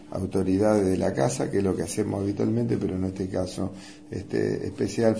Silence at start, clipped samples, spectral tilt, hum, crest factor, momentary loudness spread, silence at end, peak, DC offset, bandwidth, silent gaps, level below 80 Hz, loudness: 0 s; under 0.1%; -6.5 dB/octave; none; 18 dB; 10 LU; 0 s; -8 dBFS; 0.2%; 11 kHz; none; -54 dBFS; -26 LUFS